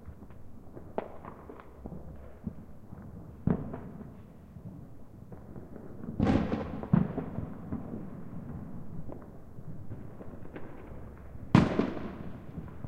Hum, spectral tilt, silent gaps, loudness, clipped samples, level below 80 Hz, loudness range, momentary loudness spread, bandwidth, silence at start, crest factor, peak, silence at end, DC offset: none; -8.5 dB/octave; none; -34 LUFS; under 0.1%; -50 dBFS; 12 LU; 21 LU; 9.2 kHz; 0 s; 30 dB; -6 dBFS; 0 s; under 0.1%